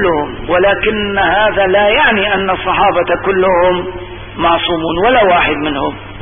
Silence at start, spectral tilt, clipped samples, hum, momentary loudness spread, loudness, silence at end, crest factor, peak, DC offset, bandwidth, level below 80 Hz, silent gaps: 0 s; -10.5 dB/octave; under 0.1%; none; 9 LU; -12 LUFS; 0 s; 12 dB; 0 dBFS; under 0.1%; 3.7 kHz; -34 dBFS; none